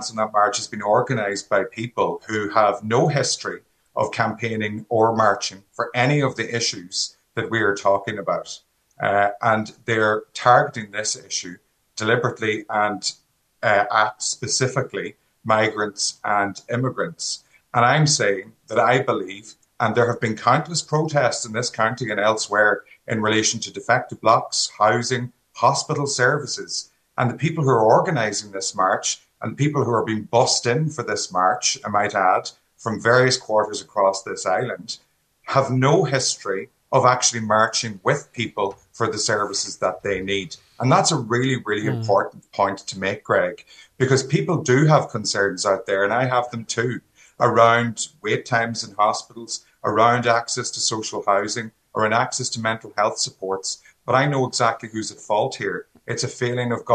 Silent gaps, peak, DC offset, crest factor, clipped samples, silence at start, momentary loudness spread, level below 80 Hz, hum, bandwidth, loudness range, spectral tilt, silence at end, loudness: none; 0 dBFS; under 0.1%; 22 dB; under 0.1%; 0 s; 10 LU; -64 dBFS; none; 10 kHz; 3 LU; -4 dB/octave; 0 s; -21 LUFS